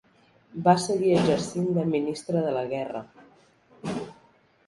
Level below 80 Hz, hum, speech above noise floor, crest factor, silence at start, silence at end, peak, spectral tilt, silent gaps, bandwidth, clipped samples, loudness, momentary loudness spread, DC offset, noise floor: -62 dBFS; none; 36 dB; 20 dB; 0.55 s; 0.55 s; -6 dBFS; -6 dB/octave; none; 11.5 kHz; under 0.1%; -26 LUFS; 16 LU; under 0.1%; -60 dBFS